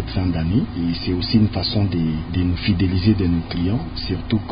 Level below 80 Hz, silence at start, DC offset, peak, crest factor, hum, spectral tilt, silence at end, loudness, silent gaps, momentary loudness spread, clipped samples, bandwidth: -30 dBFS; 0 s; under 0.1%; -4 dBFS; 16 dB; none; -12 dB/octave; 0 s; -20 LUFS; none; 5 LU; under 0.1%; 5.2 kHz